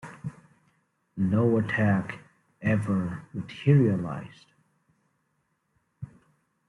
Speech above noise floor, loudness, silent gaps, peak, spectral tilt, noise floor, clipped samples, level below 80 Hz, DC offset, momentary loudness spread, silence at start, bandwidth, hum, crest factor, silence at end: 49 dB; -26 LUFS; none; -8 dBFS; -9 dB/octave; -74 dBFS; under 0.1%; -62 dBFS; under 0.1%; 23 LU; 0.05 s; 11 kHz; none; 20 dB; 0.65 s